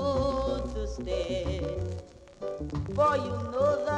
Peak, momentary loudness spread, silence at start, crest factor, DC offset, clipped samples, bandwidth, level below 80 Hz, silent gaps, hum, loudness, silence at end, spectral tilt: -14 dBFS; 12 LU; 0 s; 16 dB; under 0.1%; under 0.1%; 10 kHz; -40 dBFS; none; none; -30 LUFS; 0 s; -6.5 dB/octave